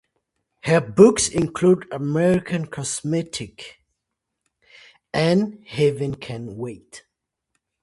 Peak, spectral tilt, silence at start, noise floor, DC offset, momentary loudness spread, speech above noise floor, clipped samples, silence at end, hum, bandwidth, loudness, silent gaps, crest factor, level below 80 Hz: 0 dBFS; -5.5 dB/octave; 0.65 s; -81 dBFS; under 0.1%; 19 LU; 60 dB; under 0.1%; 0.85 s; none; 11.5 kHz; -21 LUFS; none; 22 dB; -54 dBFS